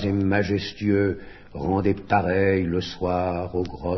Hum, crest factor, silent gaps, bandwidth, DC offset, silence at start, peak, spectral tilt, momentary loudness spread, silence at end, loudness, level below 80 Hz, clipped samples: none; 18 dB; none; 6.2 kHz; under 0.1%; 0 s; -6 dBFS; -7.5 dB/octave; 7 LU; 0 s; -24 LUFS; -46 dBFS; under 0.1%